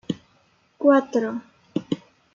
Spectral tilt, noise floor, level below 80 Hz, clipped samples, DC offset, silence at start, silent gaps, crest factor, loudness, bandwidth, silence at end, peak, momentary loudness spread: -7 dB/octave; -62 dBFS; -70 dBFS; under 0.1%; under 0.1%; 0.1 s; none; 20 dB; -24 LUFS; 7.4 kHz; 0.4 s; -4 dBFS; 15 LU